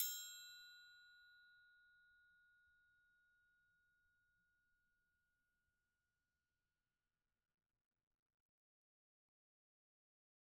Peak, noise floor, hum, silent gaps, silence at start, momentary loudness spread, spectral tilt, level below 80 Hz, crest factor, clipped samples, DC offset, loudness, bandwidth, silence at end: -24 dBFS; under -90 dBFS; none; none; 0 s; 20 LU; 4.5 dB/octave; under -90 dBFS; 36 dB; under 0.1%; under 0.1%; -51 LUFS; 12 kHz; 7.9 s